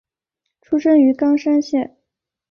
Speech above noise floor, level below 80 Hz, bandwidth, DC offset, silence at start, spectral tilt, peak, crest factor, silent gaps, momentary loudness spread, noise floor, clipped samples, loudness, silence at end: 64 dB; -64 dBFS; 6.8 kHz; under 0.1%; 0.7 s; -5.5 dB/octave; -4 dBFS; 14 dB; none; 9 LU; -79 dBFS; under 0.1%; -16 LUFS; 0.7 s